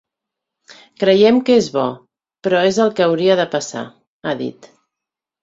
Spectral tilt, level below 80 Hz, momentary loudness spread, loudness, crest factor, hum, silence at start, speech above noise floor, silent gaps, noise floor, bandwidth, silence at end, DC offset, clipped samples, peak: -5 dB/octave; -60 dBFS; 16 LU; -16 LUFS; 16 dB; none; 1 s; 69 dB; 4.07-4.20 s; -85 dBFS; 7.8 kHz; 0.9 s; under 0.1%; under 0.1%; -2 dBFS